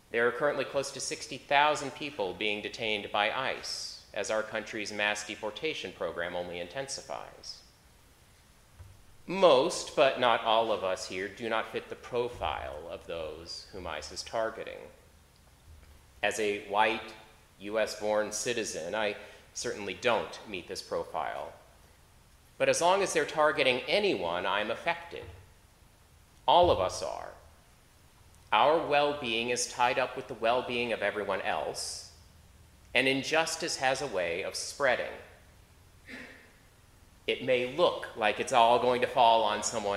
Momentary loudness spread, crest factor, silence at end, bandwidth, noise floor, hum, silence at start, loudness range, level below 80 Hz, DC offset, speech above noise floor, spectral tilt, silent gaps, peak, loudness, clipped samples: 15 LU; 24 dB; 0 s; 15.5 kHz; -60 dBFS; none; 0.15 s; 8 LU; -60 dBFS; under 0.1%; 29 dB; -2.5 dB/octave; none; -8 dBFS; -30 LUFS; under 0.1%